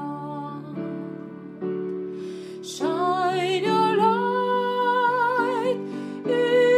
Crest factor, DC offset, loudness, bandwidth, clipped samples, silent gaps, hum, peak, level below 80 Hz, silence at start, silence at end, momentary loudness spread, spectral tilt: 14 dB; under 0.1%; -24 LUFS; 14 kHz; under 0.1%; none; none; -10 dBFS; -74 dBFS; 0 s; 0 s; 14 LU; -5.5 dB/octave